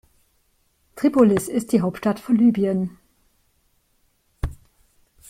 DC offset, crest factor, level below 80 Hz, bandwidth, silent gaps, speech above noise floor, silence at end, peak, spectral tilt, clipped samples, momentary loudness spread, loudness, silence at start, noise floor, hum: under 0.1%; 20 dB; -42 dBFS; 15.5 kHz; none; 46 dB; 0.75 s; -4 dBFS; -7 dB/octave; under 0.1%; 16 LU; -21 LUFS; 0.95 s; -65 dBFS; none